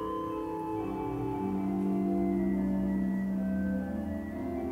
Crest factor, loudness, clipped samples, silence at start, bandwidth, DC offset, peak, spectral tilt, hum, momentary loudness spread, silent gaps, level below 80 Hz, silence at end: 12 dB; -32 LUFS; under 0.1%; 0 s; 4.6 kHz; under 0.1%; -20 dBFS; -9.5 dB/octave; none; 6 LU; none; -50 dBFS; 0 s